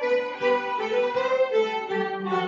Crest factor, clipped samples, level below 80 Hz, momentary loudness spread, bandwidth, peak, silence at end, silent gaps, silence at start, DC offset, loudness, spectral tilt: 14 dB; under 0.1%; -72 dBFS; 4 LU; 7.4 kHz; -10 dBFS; 0 s; none; 0 s; under 0.1%; -25 LUFS; -5 dB/octave